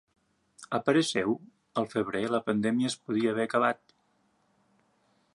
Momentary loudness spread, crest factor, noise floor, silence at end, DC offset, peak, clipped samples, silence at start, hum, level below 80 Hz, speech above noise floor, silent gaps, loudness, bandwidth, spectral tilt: 9 LU; 20 dB; -71 dBFS; 1.6 s; under 0.1%; -10 dBFS; under 0.1%; 0.6 s; none; -72 dBFS; 42 dB; none; -29 LUFS; 11.5 kHz; -5 dB/octave